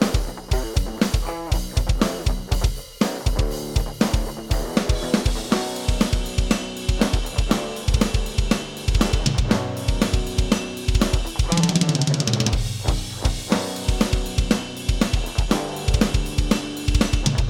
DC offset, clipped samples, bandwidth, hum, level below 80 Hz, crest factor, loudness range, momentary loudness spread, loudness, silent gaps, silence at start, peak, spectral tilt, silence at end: under 0.1%; under 0.1%; 17.5 kHz; none; -24 dBFS; 20 dB; 2 LU; 5 LU; -23 LUFS; none; 0 s; -2 dBFS; -5 dB/octave; 0 s